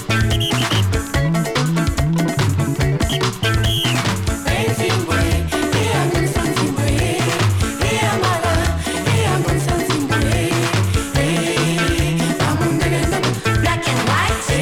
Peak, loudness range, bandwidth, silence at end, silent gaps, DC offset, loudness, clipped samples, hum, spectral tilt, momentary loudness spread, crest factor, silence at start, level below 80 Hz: -8 dBFS; 1 LU; 19 kHz; 0 s; none; under 0.1%; -18 LUFS; under 0.1%; none; -5 dB/octave; 2 LU; 8 dB; 0 s; -28 dBFS